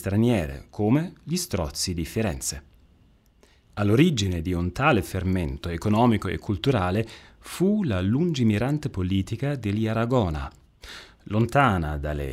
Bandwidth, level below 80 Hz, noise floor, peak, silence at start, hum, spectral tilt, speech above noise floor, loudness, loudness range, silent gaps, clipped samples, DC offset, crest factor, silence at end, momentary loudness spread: 16 kHz; -42 dBFS; -58 dBFS; -6 dBFS; 0 s; none; -6 dB/octave; 34 dB; -25 LUFS; 3 LU; none; under 0.1%; under 0.1%; 20 dB; 0 s; 13 LU